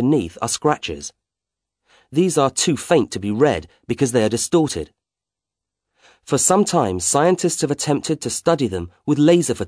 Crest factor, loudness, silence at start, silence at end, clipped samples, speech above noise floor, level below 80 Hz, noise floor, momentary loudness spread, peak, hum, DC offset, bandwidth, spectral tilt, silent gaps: 18 dB; -19 LUFS; 0 s; 0 s; under 0.1%; 69 dB; -50 dBFS; -87 dBFS; 11 LU; -2 dBFS; none; under 0.1%; 11 kHz; -4.5 dB/octave; none